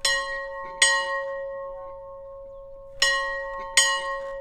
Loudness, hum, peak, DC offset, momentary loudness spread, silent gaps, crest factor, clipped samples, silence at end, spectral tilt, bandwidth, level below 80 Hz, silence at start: -23 LUFS; none; -2 dBFS; under 0.1%; 22 LU; none; 24 dB; under 0.1%; 0 s; 2 dB/octave; 17 kHz; -52 dBFS; 0 s